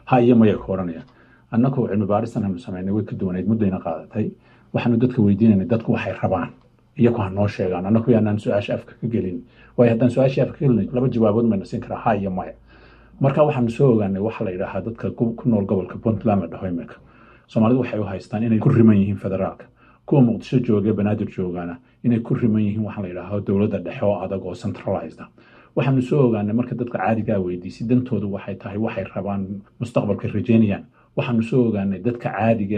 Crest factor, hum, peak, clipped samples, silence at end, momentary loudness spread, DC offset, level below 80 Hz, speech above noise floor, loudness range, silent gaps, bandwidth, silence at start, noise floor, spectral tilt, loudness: 18 dB; none; -2 dBFS; under 0.1%; 0 s; 11 LU; under 0.1%; -52 dBFS; 28 dB; 4 LU; none; 8.4 kHz; 0.05 s; -48 dBFS; -9.5 dB/octave; -21 LUFS